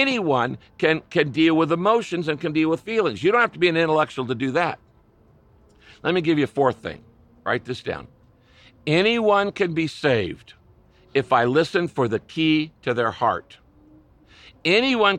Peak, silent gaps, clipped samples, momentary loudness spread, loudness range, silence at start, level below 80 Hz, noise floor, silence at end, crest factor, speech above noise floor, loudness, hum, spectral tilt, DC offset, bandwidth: -4 dBFS; none; under 0.1%; 11 LU; 5 LU; 0 s; -58 dBFS; -56 dBFS; 0 s; 18 dB; 35 dB; -21 LUFS; none; -6 dB/octave; under 0.1%; 10 kHz